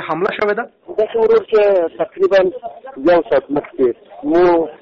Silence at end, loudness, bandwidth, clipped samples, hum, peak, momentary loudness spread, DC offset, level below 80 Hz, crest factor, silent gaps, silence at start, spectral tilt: 0.05 s; -16 LUFS; 6.4 kHz; under 0.1%; none; -6 dBFS; 10 LU; under 0.1%; -50 dBFS; 10 dB; none; 0 s; -4 dB/octave